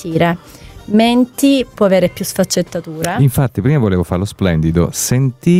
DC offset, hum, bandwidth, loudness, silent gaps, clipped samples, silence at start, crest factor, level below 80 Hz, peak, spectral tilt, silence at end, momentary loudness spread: under 0.1%; none; 16 kHz; -14 LUFS; none; under 0.1%; 0 s; 12 dB; -36 dBFS; 0 dBFS; -6 dB/octave; 0 s; 6 LU